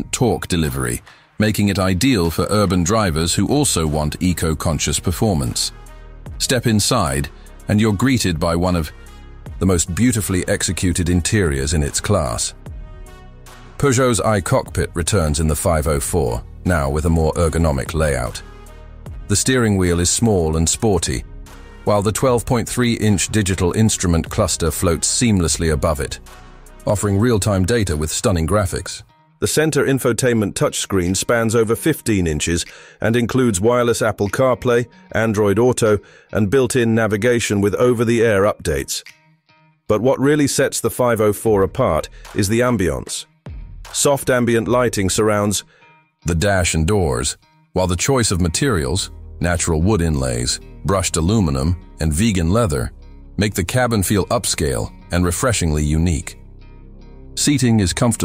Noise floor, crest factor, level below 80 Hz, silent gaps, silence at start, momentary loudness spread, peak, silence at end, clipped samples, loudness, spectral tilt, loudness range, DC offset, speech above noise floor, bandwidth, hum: -55 dBFS; 14 dB; -32 dBFS; none; 0 s; 8 LU; -4 dBFS; 0 s; under 0.1%; -18 LUFS; -4.5 dB/octave; 2 LU; under 0.1%; 38 dB; 16 kHz; none